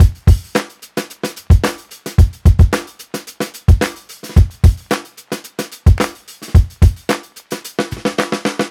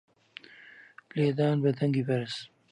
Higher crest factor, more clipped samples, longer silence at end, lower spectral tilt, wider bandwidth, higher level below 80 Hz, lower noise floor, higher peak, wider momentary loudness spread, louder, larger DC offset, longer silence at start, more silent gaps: about the same, 14 dB vs 16 dB; neither; second, 0 s vs 0.25 s; second, -6 dB/octave vs -7.5 dB/octave; first, 16 kHz vs 10 kHz; first, -18 dBFS vs -76 dBFS; second, -32 dBFS vs -53 dBFS; first, 0 dBFS vs -14 dBFS; second, 16 LU vs 24 LU; first, -16 LUFS vs -29 LUFS; neither; second, 0 s vs 0.8 s; neither